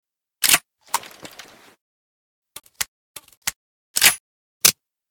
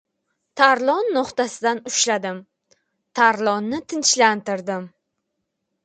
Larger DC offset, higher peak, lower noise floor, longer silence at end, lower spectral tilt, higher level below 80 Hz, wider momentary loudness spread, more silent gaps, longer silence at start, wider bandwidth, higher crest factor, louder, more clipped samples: neither; about the same, 0 dBFS vs 0 dBFS; second, -46 dBFS vs -77 dBFS; second, 0.4 s vs 0.95 s; second, 1.5 dB/octave vs -2 dB/octave; first, -60 dBFS vs -70 dBFS; first, 24 LU vs 15 LU; first, 1.81-2.42 s, 2.88-3.15 s, 3.37-3.42 s, 3.56-3.94 s, 4.20-4.61 s vs none; second, 0.4 s vs 0.55 s; first, 19.5 kHz vs 9.6 kHz; first, 26 dB vs 20 dB; about the same, -19 LUFS vs -19 LUFS; neither